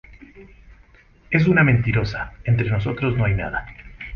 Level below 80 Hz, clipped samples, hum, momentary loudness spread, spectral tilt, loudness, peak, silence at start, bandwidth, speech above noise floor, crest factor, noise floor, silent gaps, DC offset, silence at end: -38 dBFS; under 0.1%; none; 13 LU; -8.5 dB/octave; -20 LUFS; -2 dBFS; 0.35 s; 6.4 kHz; 32 dB; 20 dB; -51 dBFS; none; under 0.1%; 0 s